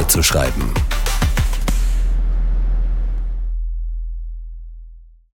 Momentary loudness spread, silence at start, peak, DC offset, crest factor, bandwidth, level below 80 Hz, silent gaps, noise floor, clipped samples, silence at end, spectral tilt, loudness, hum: 17 LU; 0 s; -2 dBFS; under 0.1%; 16 dB; 18 kHz; -18 dBFS; none; -40 dBFS; under 0.1%; 0.25 s; -3.5 dB/octave; -21 LUFS; none